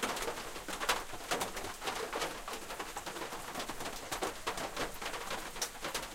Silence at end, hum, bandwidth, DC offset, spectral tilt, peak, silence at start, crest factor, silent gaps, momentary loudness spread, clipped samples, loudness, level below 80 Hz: 0 s; none; 16.5 kHz; under 0.1%; -1.5 dB/octave; -16 dBFS; 0 s; 24 dB; none; 6 LU; under 0.1%; -39 LUFS; -54 dBFS